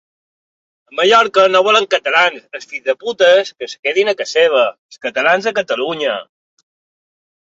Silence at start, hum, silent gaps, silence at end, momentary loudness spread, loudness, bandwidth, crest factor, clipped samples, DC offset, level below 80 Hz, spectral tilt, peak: 0.95 s; none; 3.79-3.83 s, 4.78-4.89 s; 1.3 s; 13 LU; -14 LUFS; 7.8 kHz; 16 dB; under 0.1%; under 0.1%; -66 dBFS; -2 dB/octave; 0 dBFS